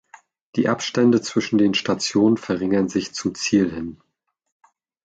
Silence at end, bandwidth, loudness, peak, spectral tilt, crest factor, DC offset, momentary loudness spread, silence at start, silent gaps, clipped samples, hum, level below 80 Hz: 1.1 s; 9.2 kHz; -20 LUFS; -6 dBFS; -5 dB/octave; 16 dB; under 0.1%; 8 LU; 0.55 s; none; under 0.1%; none; -56 dBFS